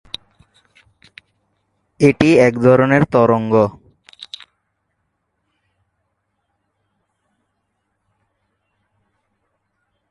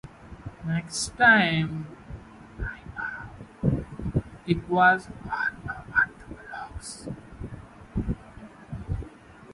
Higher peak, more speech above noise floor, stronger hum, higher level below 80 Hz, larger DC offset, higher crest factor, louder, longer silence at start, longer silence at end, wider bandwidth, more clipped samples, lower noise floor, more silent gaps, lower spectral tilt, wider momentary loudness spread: first, 0 dBFS vs -6 dBFS; first, 59 dB vs 24 dB; neither; second, -52 dBFS vs -44 dBFS; neither; about the same, 20 dB vs 24 dB; first, -13 LUFS vs -26 LUFS; first, 2 s vs 0.05 s; first, 5.85 s vs 0 s; about the same, 11.5 kHz vs 11.5 kHz; neither; first, -71 dBFS vs -48 dBFS; neither; first, -7 dB/octave vs -5 dB/octave; about the same, 23 LU vs 24 LU